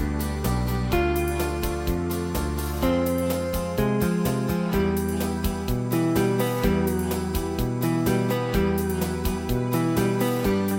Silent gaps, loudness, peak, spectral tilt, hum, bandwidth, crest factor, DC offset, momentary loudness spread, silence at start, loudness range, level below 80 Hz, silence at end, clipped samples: none; -25 LUFS; -10 dBFS; -6 dB/octave; none; 17 kHz; 14 dB; under 0.1%; 4 LU; 0 s; 1 LU; -34 dBFS; 0 s; under 0.1%